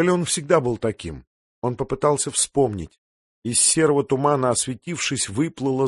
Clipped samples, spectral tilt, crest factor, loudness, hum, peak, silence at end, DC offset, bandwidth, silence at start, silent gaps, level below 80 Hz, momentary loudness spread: under 0.1%; -4 dB/octave; 18 dB; -21 LUFS; none; -4 dBFS; 0 s; under 0.1%; 12 kHz; 0 s; 1.27-1.62 s, 2.98-3.42 s; -50 dBFS; 16 LU